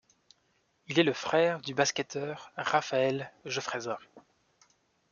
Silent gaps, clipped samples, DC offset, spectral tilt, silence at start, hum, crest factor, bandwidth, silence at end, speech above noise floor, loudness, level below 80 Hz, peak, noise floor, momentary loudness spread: none; under 0.1%; under 0.1%; -4 dB/octave; 0.9 s; none; 22 dB; 7.4 kHz; 0.9 s; 42 dB; -30 LUFS; -76 dBFS; -10 dBFS; -73 dBFS; 10 LU